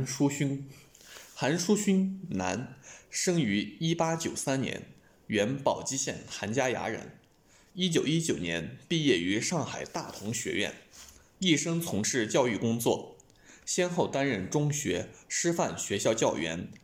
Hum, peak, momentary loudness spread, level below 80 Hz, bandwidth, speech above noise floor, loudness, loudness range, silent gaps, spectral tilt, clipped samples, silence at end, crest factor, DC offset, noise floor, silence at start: none; -12 dBFS; 12 LU; -66 dBFS; 16.5 kHz; 32 dB; -30 LUFS; 2 LU; none; -4 dB/octave; under 0.1%; 0.05 s; 18 dB; under 0.1%; -62 dBFS; 0 s